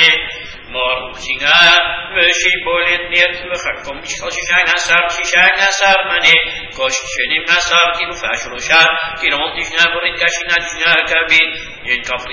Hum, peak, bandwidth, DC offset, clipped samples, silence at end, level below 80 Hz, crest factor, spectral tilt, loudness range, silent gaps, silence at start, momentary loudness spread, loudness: none; 0 dBFS; 8 kHz; under 0.1%; under 0.1%; 0 s; -42 dBFS; 14 dB; -0.5 dB/octave; 2 LU; none; 0 s; 11 LU; -12 LUFS